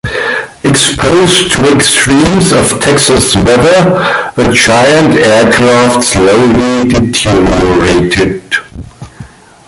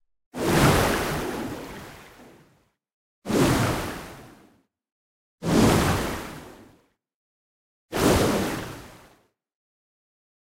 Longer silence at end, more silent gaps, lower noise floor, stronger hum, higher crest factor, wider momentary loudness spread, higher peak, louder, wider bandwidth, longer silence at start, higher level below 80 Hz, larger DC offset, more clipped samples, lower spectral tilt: second, 0.4 s vs 1.6 s; second, none vs 2.93-3.22 s, 4.92-5.38 s, 7.14-7.89 s; second, -31 dBFS vs -64 dBFS; neither; second, 8 dB vs 22 dB; second, 6 LU vs 21 LU; first, 0 dBFS vs -6 dBFS; first, -7 LUFS vs -23 LUFS; about the same, 16 kHz vs 16 kHz; second, 0.05 s vs 0.35 s; first, -28 dBFS vs -40 dBFS; neither; first, 0.1% vs under 0.1%; about the same, -4 dB/octave vs -5 dB/octave